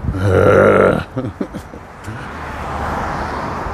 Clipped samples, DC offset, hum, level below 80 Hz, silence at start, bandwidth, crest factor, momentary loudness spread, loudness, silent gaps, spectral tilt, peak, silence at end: under 0.1%; under 0.1%; none; -32 dBFS; 0 s; 13.5 kHz; 16 dB; 20 LU; -15 LUFS; none; -7.5 dB/octave; 0 dBFS; 0 s